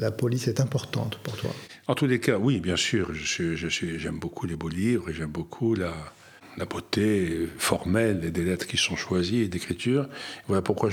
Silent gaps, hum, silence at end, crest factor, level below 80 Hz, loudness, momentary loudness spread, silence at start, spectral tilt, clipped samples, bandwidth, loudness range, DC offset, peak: none; none; 0 s; 20 dB; -50 dBFS; -27 LUFS; 10 LU; 0 s; -5 dB/octave; under 0.1%; 20 kHz; 3 LU; under 0.1%; -6 dBFS